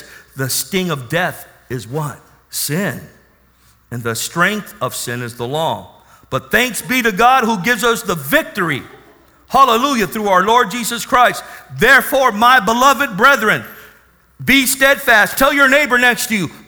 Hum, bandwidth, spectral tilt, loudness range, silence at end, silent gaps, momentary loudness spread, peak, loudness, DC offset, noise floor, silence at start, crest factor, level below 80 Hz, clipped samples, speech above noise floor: none; over 20 kHz; -3 dB/octave; 9 LU; 0.1 s; none; 14 LU; 0 dBFS; -14 LUFS; under 0.1%; -52 dBFS; 0 s; 16 dB; -44 dBFS; under 0.1%; 37 dB